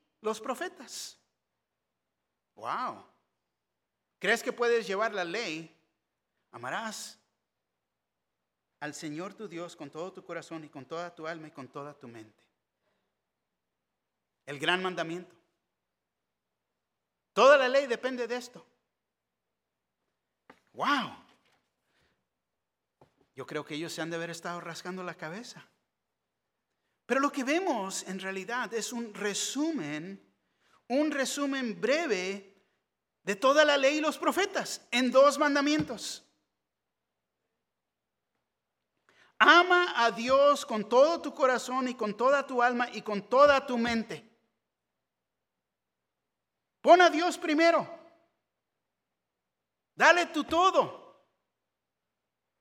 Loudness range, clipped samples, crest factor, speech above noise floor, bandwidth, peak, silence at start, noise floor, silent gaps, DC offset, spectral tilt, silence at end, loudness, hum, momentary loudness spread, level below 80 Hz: 16 LU; under 0.1%; 26 dB; 59 dB; 16.5 kHz; -4 dBFS; 0.25 s; -87 dBFS; none; under 0.1%; -3 dB/octave; 1.65 s; -27 LUFS; none; 19 LU; -74 dBFS